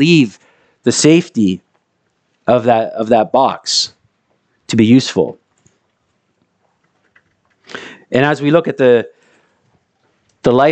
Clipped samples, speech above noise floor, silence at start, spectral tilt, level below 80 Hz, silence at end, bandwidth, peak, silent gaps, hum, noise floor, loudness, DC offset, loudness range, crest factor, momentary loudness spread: under 0.1%; 53 dB; 0 s; -5 dB/octave; -56 dBFS; 0 s; 9.2 kHz; 0 dBFS; none; none; -65 dBFS; -13 LUFS; under 0.1%; 5 LU; 16 dB; 13 LU